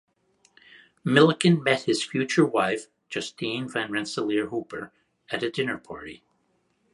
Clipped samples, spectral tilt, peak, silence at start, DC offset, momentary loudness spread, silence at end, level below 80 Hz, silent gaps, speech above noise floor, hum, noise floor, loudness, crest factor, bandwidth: under 0.1%; -5 dB/octave; -4 dBFS; 1.05 s; under 0.1%; 18 LU; 0.75 s; -68 dBFS; none; 45 dB; none; -70 dBFS; -25 LUFS; 22 dB; 11.5 kHz